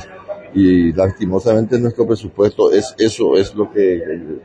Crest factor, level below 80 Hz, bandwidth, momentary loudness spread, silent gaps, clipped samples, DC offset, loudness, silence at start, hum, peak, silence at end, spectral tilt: 12 dB; -44 dBFS; 10 kHz; 9 LU; none; under 0.1%; under 0.1%; -15 LUFS; 0 s; none; -2 dBFS; 0.05 s; -7 dB/octave